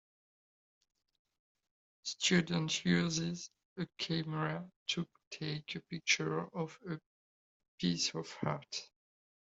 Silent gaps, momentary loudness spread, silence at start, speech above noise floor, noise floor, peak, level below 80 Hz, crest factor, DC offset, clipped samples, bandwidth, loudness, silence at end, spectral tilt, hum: 3.65-3.76 s, 4.76-4.86 s, 5.27-5.31 s, 7.06-7.60 s, 7.68-7.78 s; 13 LU; 2.05 s; over 54 dB; under -90 dBFS; -16 dBFS; -72 dBFS; 22 dB; under 0.1%; under 0.1%; 8 kHz; -36 LUFS; 0.65 s; -4 dB/octave; none